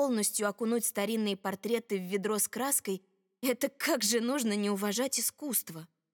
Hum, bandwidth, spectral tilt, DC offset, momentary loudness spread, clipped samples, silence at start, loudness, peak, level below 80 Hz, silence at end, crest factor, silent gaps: none; over 20 kHz; -3 dB/octave; under 0.1%; 6 LU; under 0.1%; 0 s; -31 LUFS; -14 dBFS; -88 dBFS; 0.3 s; 16 dB; none